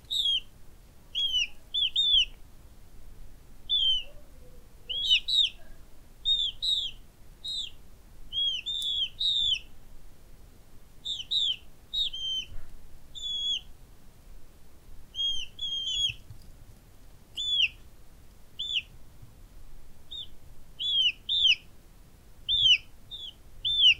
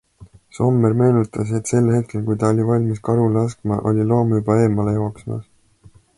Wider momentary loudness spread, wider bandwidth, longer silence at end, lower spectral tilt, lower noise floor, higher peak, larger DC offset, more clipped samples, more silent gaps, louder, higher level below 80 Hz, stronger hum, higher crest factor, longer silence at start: first, 18 LU vs 7 LU; first, 16 kHz vs 11.5 kHz; second, 0 s vs 0.75 s; second, 0.5 dB/octave vs -8.5 dB/octave; about the same, -52 dBFS vs -50 dBFS; second, -12 dBFS vs -4 dBFS; neither; neither; neither; second, -26 LUFS vs -18 LUFS; about the same, -50 dBFS vs -48 dBFS; neither; about the same, 20 dB vs 16 dB; about the same, 0.1 s vs 0.2 s